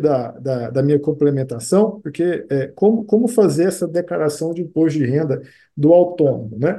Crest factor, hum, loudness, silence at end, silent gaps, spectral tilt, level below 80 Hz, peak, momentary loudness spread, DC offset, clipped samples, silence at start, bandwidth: 16 dB; none; -18 LUFS; 0 s; none; -7.5 dB/octave; -60 dBFS; 0 dBFS; 9 LU; under 0.1%; under 0.1%; 0 s; 12.5 kHz